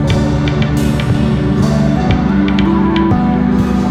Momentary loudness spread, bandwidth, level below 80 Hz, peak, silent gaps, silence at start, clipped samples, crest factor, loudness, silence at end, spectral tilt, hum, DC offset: 2 LU; 14 kHz; -24 dBFS; -2 dBFS; none; 0 s; under 0.1%; 10 dB; -13 LUFS; 0 s; -7.5 dB/octave; none; under 0.1%